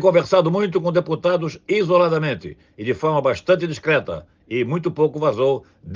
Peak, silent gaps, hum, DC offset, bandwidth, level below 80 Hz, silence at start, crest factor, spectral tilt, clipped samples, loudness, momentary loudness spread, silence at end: -2 dBFS; none; none; under 0.1%; 7.4 kHz; -58 dBFS; 0 s; 16 dB; -7 dB/octave; under 0.1%; -20 LUFS; 11 LU; 0 s